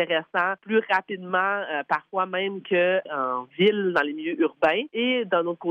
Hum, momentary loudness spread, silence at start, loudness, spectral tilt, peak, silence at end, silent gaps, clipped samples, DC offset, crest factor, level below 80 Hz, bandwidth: none; 6 LU; 0 s; -24 LUFS; -7 dB/octave; -8 dBFS; 0 s; none; under 0.1%; under 0.1%; 16 dB; -70 dBFS; 7.8 kHz